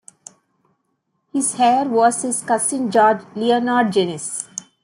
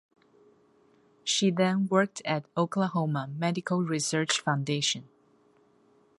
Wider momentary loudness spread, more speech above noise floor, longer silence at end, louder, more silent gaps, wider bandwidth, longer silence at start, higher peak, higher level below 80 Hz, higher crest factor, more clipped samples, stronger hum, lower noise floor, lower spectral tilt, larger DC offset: first, 10 LU vs 6 LU; first, 53 dB vs 36 dB; second, 0.2 s vs 1.15 s; first, -18 LUFS vs -28 LUFS; neither; about the same, 12.5 kHz vs 11.5 kHz; about the same, 1.35 s vs 1.25 s; first, -4 dBFS vs -8 dBFS; about the same, -70 dBFS vs -74 dBFS; second, 16 dB vs 22 dB; neither; neither; first, -71 dBFS vs -64 dBFS; about the same, -3.5 dB/octave vs -4.5 dB/octave; neither